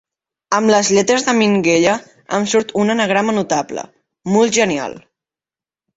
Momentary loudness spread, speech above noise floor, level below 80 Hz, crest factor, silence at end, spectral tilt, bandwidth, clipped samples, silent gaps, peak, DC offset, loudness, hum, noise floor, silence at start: 10 LU; over 75 dB; -58 dBFS; 16 dB; 0.95 s; -4 dB/octave; 8.2 kHz; under 0.1%; none; -2 dBFS; under 0.1%; -15 LUFS; none; under -90 dBFS; 0.5 s